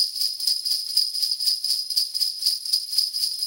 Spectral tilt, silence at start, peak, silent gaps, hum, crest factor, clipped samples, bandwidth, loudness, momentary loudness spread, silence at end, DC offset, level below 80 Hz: 5.5 dB/octave; 0 s; -6 dBFS; none; none; 20 dB; under 0.1%; 17 kHz; -21 LUFS; 2 LU; 0 s; under 0.1%; -82 dBFS